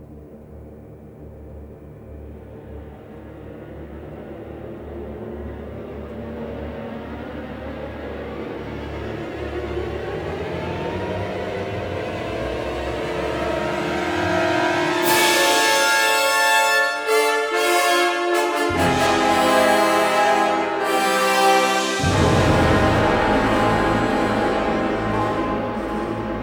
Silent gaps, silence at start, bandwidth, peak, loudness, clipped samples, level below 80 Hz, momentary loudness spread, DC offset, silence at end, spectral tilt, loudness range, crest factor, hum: none; 0 s; over 20 kHz; -4 dBFS; -19 LUFS; under 0.1%; -38 dBFS; 22 LU; under 0.1%; 0 s; -4 dB/octave; 19 LU; 18 dB; none